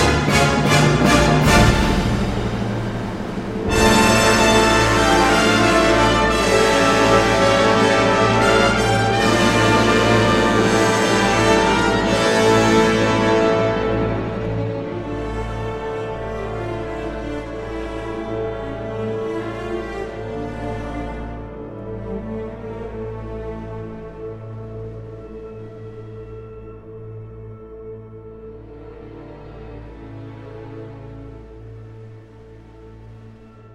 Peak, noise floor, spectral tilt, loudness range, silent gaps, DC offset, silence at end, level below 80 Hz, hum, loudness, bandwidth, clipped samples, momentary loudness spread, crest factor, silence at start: 0 dBFS; -42 dBFS; -4.5 dB/octave; 22 LU; none; under 0.1%; 0 s; -32 dBFS; none; -17 LUFS; 16 kHz; under 0.1%; 23 LU; 18 dB; 0 s